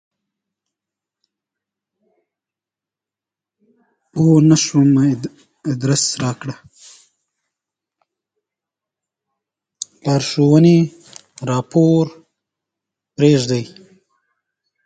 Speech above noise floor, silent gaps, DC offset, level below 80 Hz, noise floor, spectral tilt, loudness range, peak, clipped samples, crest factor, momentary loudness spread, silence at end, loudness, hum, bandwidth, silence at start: 74 dB; none; under 0.1%; -56 dBFS; -88 dBFS; -6 dB/octave; 9 LU; 0 dBFS; under 0.1%; 18 dB; 20 LU; 1.2 s; -15 LUFS; none; 9.4 kHz; 4.15 s